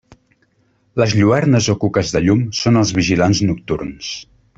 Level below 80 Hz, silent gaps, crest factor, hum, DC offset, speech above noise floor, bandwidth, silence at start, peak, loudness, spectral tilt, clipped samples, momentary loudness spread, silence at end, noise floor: -44 dBFS; none; 14 dB; none; under 0.1%; 45 dB; 8 kHz; 0.95 s; -2 dBFS; -16 LUFS; -5.5 dB/octave; under 0.1%; 12 LU; 0.35 s; -60 dBFS